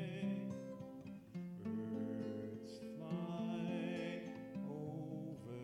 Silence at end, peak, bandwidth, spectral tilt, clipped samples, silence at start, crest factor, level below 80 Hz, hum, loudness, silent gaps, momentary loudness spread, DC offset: 0 s; -30 dBFS; 13.5 kHz; -7.5 dB/octave; under 0.1%; 0 s; 14 dB; -80 dBFS; none; -46 LUFS; none; 8 LU; under 0.1%